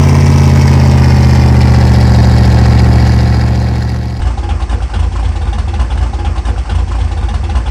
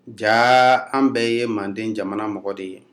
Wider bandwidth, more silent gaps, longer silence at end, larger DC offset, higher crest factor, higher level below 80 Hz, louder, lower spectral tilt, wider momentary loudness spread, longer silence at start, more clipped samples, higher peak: second, 10.5 kHz vs 13.5 kHz; neither; second, 0 s vs 0.15 s; first, 1% vs under 0.1%; second, 8 dB vs 18 dB; first, -12 dBFS vs -74 dBFS; first, -10 LUFS vs -19 LUFS; first, -7 dB/octave vs -4.5 dB/octave; second, 9 LU vs 14 LU; about the same, 0 s vs 0.05 s; first, 1% vs under 0.1%; about the same, 0 dBFS vs -2 dBFS